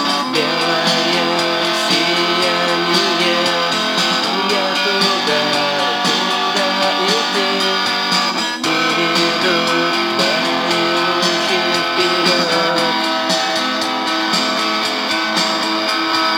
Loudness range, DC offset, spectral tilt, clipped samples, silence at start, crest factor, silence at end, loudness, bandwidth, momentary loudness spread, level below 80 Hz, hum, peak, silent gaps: 1 LU; under 0.1%; -2.5 dB/octave; under 0.1%; 0 s; 14 dB; 0 s; -15 LUFS; over 20 kHz; 2 LU; -68 dBFS; none; -2 dBFS; none